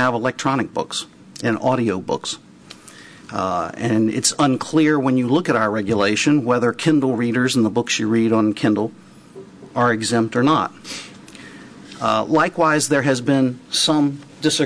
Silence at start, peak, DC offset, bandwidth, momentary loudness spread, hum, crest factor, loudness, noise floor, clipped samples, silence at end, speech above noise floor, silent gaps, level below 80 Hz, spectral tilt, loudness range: 0 s; -4 dBFS; under 0.1%; 11 kHz; 12 LU; none; 16 dB; -19 LUFS; -42 dBFS; under 0.1%; 0 s; 24 dB; none; -58 dBFS; -4.5 dB/octave; 5 LU